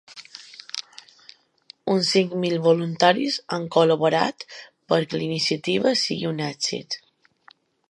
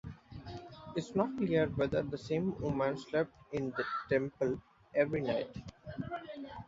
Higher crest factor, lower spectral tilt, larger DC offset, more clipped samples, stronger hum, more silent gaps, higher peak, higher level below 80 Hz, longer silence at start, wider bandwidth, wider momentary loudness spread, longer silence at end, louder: about the same, 22 dB vs 20 dB; second, -4.5 dB/octave vs -6 dB/octave; neither; neither; neither; neither; first, -2 dBFS vs -16 dBFS; second, -70 dBFS vs -60 dBFS; about the same, 0.1 s vs 0.05 s; first, 11.5 kHz vs 7.6 kHz; about the same, 18 LU vs 16 LU; first, 0.95 s vs 0 s; first, -22 LUFS vs -35 LUFS